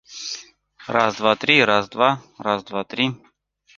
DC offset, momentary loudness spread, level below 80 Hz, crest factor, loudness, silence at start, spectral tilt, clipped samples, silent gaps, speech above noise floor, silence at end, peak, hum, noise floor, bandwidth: under 0.1%; 16 LU; -62 dBFS; 20 dB; -20 LUFS; 0.1 s; -4 dB/octave; under 0.1%; none; 26 dB; 0.6 s; -2 dBFS; 50 Hz at -55 dBFS; -46 dBFS; 7.6 kHz